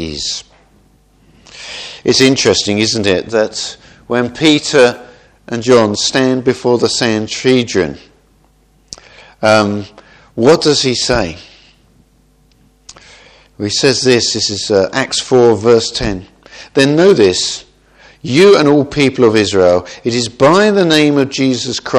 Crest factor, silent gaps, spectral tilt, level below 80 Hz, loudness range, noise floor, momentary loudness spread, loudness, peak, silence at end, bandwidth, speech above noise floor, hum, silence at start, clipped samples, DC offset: 14 dB; none; -4 dB/octave; -42 dBFS; 5 LU; -51 dBFS; 15 LU; -12 LUFS; 0 dBFS; 0 s; 12.5 kHz; 40 dB; none; 0 s; 0.2%; under 0.1%